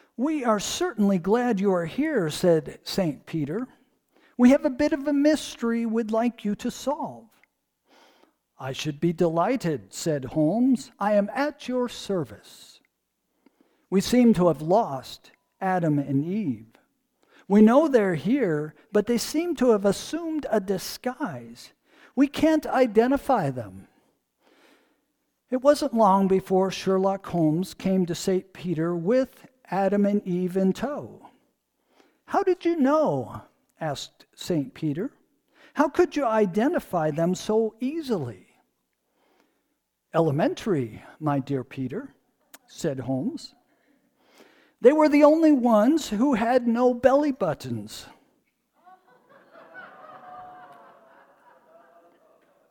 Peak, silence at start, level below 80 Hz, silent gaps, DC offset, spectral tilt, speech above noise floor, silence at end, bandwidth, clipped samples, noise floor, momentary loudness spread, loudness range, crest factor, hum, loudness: -4 dBFS; 0.2 s; -58 dBFS; none; under 0.1%; -6 dB/octave; 54 dB; 1.95 s; 19 kHz; under 0.1%; -77 dBFS; 15 LU; 7 LU; 20 dB; none; -24 LUFS